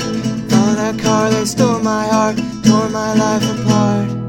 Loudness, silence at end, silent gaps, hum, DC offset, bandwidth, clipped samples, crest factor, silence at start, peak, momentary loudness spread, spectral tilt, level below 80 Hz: -15 LUFS; 0 s; none; none; under 0.1%; 16.5 kHz; under 0.1%; 14 dB; 0 s; 0 dBFS; 3 LU; -5.5 dB/octave; -44 dBFS